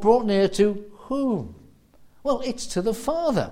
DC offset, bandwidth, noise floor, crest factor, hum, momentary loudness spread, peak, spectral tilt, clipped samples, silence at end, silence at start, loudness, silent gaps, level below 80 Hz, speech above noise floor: under 0.1%; 16 kHz; -52 dBFS; 18 dB; none; 11 LU; -6 dBFS; -5.5 dB/octave; under 0.1%; 0 s; 0 s; -24 LUFS; none; -48 dBFS; 30 dB